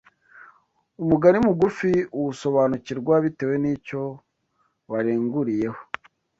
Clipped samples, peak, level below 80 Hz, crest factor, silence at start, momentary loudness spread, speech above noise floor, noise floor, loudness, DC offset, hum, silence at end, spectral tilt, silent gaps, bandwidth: under 0.1%; -2 dBFS; -56 dBFS; 20 dB; 0.35 s; 13 LU; 48 dB; -70 dBFS; -23 LUFS; under 0.1%; none; 0.55 s; -8 dB/octave; none; 8 kHz